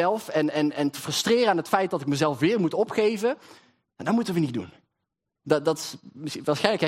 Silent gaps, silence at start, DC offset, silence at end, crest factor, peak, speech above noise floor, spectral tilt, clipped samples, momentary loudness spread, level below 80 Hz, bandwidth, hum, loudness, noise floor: none; 0 s; under 0.1%; 0 s; 22 dB; -4 dBFS; 58 dB; -5 dB/octave; under 0.1%; 12 LU; -70 dBFS; 16 kHz; none; -25 LUFS; -83 dBFS